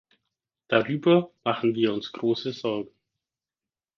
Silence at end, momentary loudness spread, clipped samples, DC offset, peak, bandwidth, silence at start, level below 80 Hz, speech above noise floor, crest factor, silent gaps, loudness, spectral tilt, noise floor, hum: 1.1 s; 9 LU; under 0.1%; under 0.1%; -6 dBFS; 6.6 kHz; 0.7 s; -70 dBFS; over 65 dB; 20 dB; none; -25 LUFS; -7 dB/octave; under -90 dBFS; none